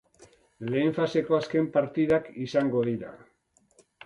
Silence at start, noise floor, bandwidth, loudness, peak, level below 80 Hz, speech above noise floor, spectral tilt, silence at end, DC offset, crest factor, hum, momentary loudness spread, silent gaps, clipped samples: 0.2 s; -64 dBFS; 10.5 kHz; -27 LUFS; -12 dBFS; -64 dBFS; 38 dB; -7.5 dB/octave; 0.9 s; under 0.1%; 16 dB; none; 7 LU; none; under 0.1%